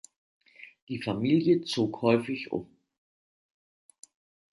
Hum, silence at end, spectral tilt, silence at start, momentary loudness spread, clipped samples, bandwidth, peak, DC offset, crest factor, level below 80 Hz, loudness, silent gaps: none; 1.9 s; -6.5 dB/octave; 0.6 s; 15 LU; under 0.1%; 11.5 kHz; -10 dBFS; under 0.1%; 22 dB; -68 dBFS; -28 LUFS; 0.82-0.87 s